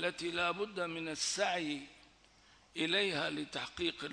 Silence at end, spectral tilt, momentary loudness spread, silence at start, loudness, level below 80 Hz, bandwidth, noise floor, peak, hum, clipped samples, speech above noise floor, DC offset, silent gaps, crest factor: 0 s; -2.5 dB/octave; 9 LU; 0 s; -36 LUFS; -70 dBFS; 10.5 kHz; -65 dBFS; -18 dBFS; none; under 0.1%; 28 dB; under 0.1%; none; 18 dB